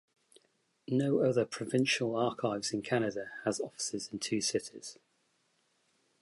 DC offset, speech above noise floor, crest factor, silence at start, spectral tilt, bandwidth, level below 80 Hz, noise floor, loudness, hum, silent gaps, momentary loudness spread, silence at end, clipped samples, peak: under 0.1%; 42 dB; 18 dB; 0.9 s; -4 dB/octave; 11.5 kHz; -74 dBFS; -75 dBFS; -33 LUFS; none; none; 8 LU; 1.3 s; under 0.1%; -16 dBFS